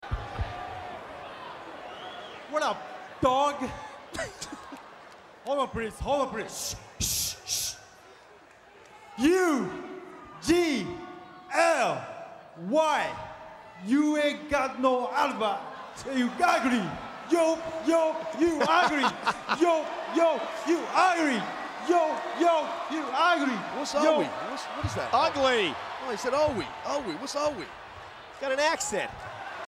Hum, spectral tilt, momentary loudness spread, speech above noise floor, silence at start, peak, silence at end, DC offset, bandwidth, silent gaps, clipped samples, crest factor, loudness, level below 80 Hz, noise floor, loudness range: none; -3.5 dB/octave; 17 LU; 27 dB; 0 s; -10 dBFS; 0.05 s; under 0.1%; 16 kHz; none; under 0.1%; 20 dB; -27 LUFS; -52 dBFS; -54 dBFS; 6 LU